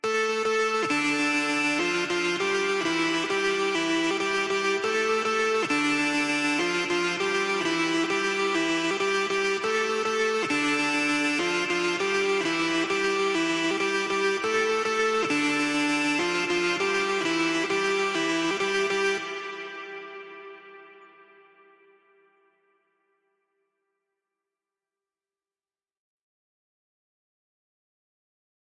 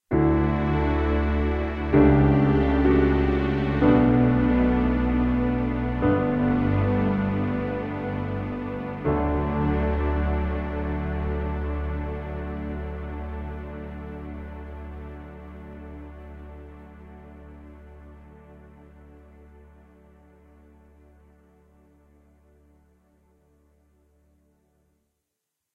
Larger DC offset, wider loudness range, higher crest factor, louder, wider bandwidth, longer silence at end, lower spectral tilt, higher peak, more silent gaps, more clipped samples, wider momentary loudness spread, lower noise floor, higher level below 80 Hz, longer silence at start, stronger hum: neither; second, 4 LU vs 22 LU; second, 12 dB vs 20 dB; about the same, -25 LUFS vs -24 LUFS; first, 11.5 kHz vs 5.2 kHz; first, 7.75 s vs 6.7 s; second, -2.5 dB/octave vs -10 dB/octave; second, -16 dBFS vs -6 dBFS; neither; neither; second, 2 LU vs 22 LU; first, under -90 dBFS vs -83 dBFS; second, -68 dBFS vs -32 dBFS; about the same, 0.05 s vs 0.1 s; neither